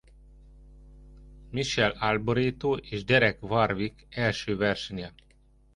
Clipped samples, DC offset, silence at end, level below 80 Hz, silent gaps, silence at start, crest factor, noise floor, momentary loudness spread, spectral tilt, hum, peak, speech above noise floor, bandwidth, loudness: under 0.1%; under 0.1%; 0.65 s; -50 dBFS; none; 0.6 s; 22 dB; -60 dBFS; 12 LU; -5.5 dB/octave; none; -8 dBFS; 33 dB; 11.5 kHz; -27 LUFS